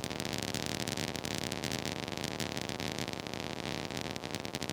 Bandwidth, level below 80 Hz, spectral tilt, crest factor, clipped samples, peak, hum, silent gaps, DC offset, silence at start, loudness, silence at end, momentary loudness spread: over 20 kHz; -58 dBFS; -3.5 dB/octave; 26 dB; under 0.1%; -12 dBFS; none; none; under 0.1%; 0 s; -37 LUFS; 0 s; 3 LU